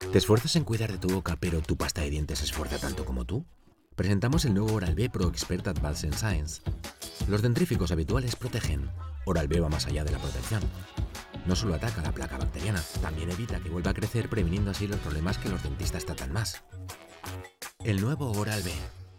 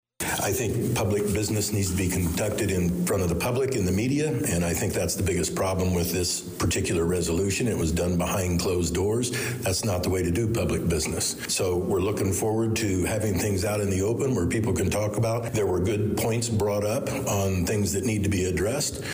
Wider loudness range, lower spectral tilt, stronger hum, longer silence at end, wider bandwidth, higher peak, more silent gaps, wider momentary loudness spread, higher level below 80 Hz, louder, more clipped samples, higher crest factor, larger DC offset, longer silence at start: first, 4 LU vs 0 LU; about the same, -5.5 dB/octave vs -5 dB/octave; neither; about the same, 0 s vs 0 s; first, 18 kHz vs 16 kHz; first, -10 dBFS vs -16 dBFS; neither; first, 11 LU vs 1 LU; first, -36 dBFS vs -44 dBFS; second, -30 LUFS vs -25 LUFS; neither; first, 20 dB vs 8 dB; neither; second, 0 s vs 0.2 s